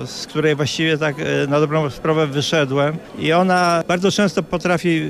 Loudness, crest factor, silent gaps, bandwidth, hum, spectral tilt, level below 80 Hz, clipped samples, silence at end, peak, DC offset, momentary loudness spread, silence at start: -18 LUFS; 14 dB; none; 14.5 kHz; none; -5 dB/octave; -50 dBFS; under 0.1%; 0 s; -4 dBFS; under 0.1%; 5 LU; 0 s